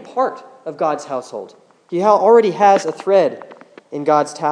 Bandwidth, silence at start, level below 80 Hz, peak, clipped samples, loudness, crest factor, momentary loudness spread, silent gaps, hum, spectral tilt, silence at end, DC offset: 10.5 kHz; 0 s; -82 dBFS; 0 dBFS; under 0.1%; -16 LUFS; 16 dB; 20 LU; none; none; -5.5 dB/octave; 0 s; under 0.1%